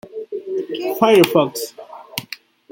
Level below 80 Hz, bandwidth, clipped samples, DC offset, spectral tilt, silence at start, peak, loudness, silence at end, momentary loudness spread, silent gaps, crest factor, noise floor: -62 dBFS; 17 kHz; under 0.1%; under 0.1%; -4.5 dB/octave; 0.05 s; 0 dBFS; -17 LUFS; 0.35 s; 21 LU; none; 20 dB; -39 dBFS